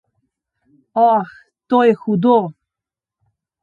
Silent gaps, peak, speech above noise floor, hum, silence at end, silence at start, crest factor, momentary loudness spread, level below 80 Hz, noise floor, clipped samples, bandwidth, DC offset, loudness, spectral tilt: none; -2 dBFS; 72 dB; none; 1.1 s; 0.95 s; 18 dB; 12 LU; -66 dBFS; -87 dBFS; under 0.1%; 4.8 kHz; under 0.1%; -16 LUFS; -9 dB/octave